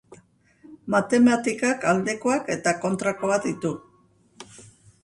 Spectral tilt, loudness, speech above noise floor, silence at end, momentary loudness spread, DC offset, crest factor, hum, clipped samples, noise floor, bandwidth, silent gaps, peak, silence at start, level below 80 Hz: -5 dB/octave; -23 LUFS; 37 dB; 0.4 s; 21 LU; under 0.1%; 16 dB; none; under 0.1%; -60 dBFS; 11.5 kHz; none; -8 dBFS; 0.1 s; -64 dBFS